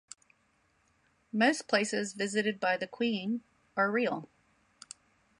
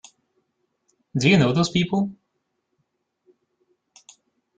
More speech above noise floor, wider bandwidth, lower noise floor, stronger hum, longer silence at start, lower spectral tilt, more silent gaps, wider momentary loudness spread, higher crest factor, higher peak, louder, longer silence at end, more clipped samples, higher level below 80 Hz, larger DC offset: second, 41 dB vs 56 dB; first, 11 kHz vs 9 kHz; second, -72 dBFS vs -76 dBFS; neither; first, 1.35 s vs 1.15 s; second, -4 dB/octave vs -5.5 dB/octave; neither; first, 22 LU vs 12 LU; about the same, 20 dB vs 22 dB; second, -14 dBFS vs -4 dBFS; second, -31 LUFS vs -21 LUFS; second, 1.15 s vs 2.45 s; neither; second, -80 dBFS vs -58 dBFS; neither